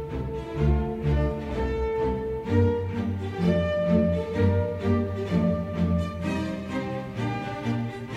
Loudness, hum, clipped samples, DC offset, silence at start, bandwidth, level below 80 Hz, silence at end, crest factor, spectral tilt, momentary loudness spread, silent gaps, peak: -27 LUFS; none; under 0.1%; under 0.1%; 0 s; 9.4 kHz; -36 dBFS; 0 s; 16 dB; -8.5 dB/octave; 7 LU; none; -10 dBFS